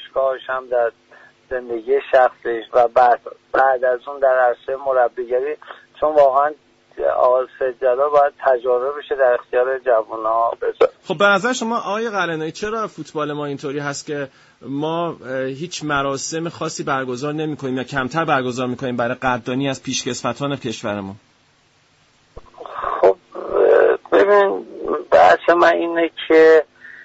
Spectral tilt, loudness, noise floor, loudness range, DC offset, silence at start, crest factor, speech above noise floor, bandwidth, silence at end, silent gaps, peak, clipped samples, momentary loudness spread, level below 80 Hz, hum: -4.5 dB/octave; -18 LUFS; -57 dBFS; 9 LU; under 0.1%; 0 s; 16 dB; 39 dB; 8 kHz; 0 s; none; -4 dBFS; under 0.1%; 12 LU; -56 dBFS; none